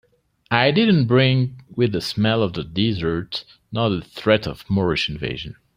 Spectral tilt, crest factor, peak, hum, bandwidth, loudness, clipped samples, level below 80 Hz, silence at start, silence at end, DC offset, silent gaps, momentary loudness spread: -7 dB/octave; 18 dB; -2 dBFS; none; 15.5 kHz; -20 LUFS; under 0.1%; -48 dBFS; 0.5 s; 0.25 s; under 0.1%; none; 12 LU